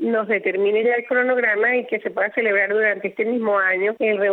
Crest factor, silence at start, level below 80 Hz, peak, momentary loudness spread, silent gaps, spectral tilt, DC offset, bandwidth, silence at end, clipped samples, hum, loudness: 12 dB; 0 s; -74 dBFS; -8 dBFS; 5 LU; none; -8 dB/octave; under 0.1%; 4.1 kHz; 0 s; under 0.1%; none; -19 LUFS